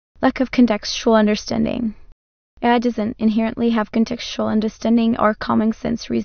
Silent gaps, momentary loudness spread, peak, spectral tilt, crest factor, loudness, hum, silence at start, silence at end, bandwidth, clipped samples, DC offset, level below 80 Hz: 2.12-2.57 s; 6 LU; -4 dBFS; -5.5 dB/octave; 16 dB; -19 LUFS; none; 0.2 s; 0 s; 6.6 kHz; under 0.1%; under 0.1%; -44 dBFS